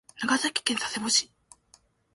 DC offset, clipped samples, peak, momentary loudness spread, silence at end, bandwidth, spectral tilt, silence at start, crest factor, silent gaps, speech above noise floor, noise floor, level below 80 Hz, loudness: under 0.1%; under 0.1%; -6 dBFS; 5 LU; 0.9 s; 11.5 kHz; -0.5 dB/octave; 0.15 s; 24 dB; none; 35 dB; -62 dBFS; -70 dBFS; -26 LUFS